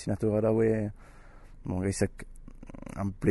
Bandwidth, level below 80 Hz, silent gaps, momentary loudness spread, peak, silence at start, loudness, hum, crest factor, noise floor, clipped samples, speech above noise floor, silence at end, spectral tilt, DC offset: 11.5 kHz; -48 dBFS; none; 23 LU; -12 dBFS; 0 s; -30 LUFS; none; 18 dB; -48 dBFS; under 0.1%; 20 dB; 0 s; -7 dB/octave; under 0.1%